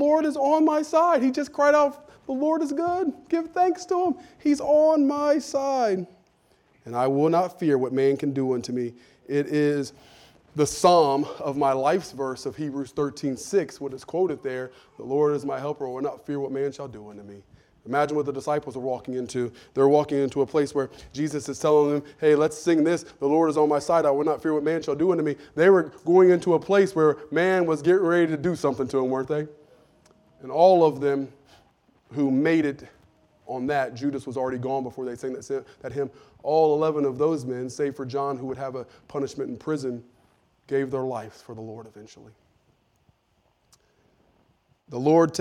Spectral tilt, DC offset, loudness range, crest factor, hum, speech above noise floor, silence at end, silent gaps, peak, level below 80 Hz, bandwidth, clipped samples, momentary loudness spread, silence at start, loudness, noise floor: -6 dB/octave; under 0.1%; 9 LU; 20 dB; none; 44 dB; 0 s; none; -4 dBFS; -64 dBFS; 14 kHz; under 0.1%; 13 LU; 0 s; -24 LUFS; -68 dBFS